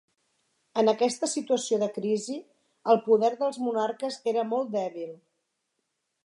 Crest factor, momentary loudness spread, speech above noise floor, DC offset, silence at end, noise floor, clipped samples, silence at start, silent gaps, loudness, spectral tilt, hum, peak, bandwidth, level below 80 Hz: 20 dB; 12 LU; 53 dB; under 0.1%; 1.1 s; -80 dBFS; under 0.1%; 0.75 s; none; -27 LUFS; -4 dB/octave; none; -8 dBFS; 11.5 kHz; -84 dBFS